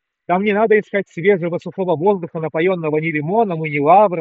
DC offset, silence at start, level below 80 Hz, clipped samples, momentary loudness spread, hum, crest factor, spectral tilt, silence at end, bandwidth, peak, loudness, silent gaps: under 0.1%; 0.3 s; -68 dBFS; under 0.1%; 9 LU; none; 16 dB; -6 dB/octave; 0 s; 7.2 kHz; -2 dBFS; -17 LUFS; none